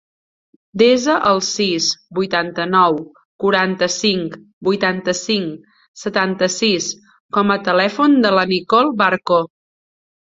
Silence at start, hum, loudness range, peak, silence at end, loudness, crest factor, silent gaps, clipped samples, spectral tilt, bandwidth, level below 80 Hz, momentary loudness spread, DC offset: 0.75 s; none; 3 LU; 0 dBFS; 0.8 s; -16 LUFS; 16 dB; 3.25-3.39 s, 4.53-4.61 s, 5.88-5.94 s, 7.20-7.29 s; under 0.1%; -3.5 dB/octave; 7.8 kHz; -60 dBFS; 9 LU; under 0.1%